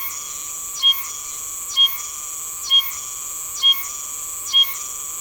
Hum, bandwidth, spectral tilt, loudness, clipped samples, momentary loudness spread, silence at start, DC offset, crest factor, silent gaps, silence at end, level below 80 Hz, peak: none; over 20 kHz; 3.5 dB/octave; -19 LUFS; under 0.1%; 11 LU; 0 s; under 0.1%; 16 dB; none; 0 s; -58 dBFS; -6 dBFS